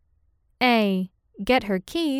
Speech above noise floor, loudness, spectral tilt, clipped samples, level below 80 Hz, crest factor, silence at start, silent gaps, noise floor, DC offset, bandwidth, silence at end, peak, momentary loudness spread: 43 dB; -23 LUFS; -5.5 dB/octave; under 0.1%; -52 dBFS; 16 dB; 0.6 s; none; -65 dBFS; under 0.1%; 16 kHz; 0 s; -8 dBFS; 12 LU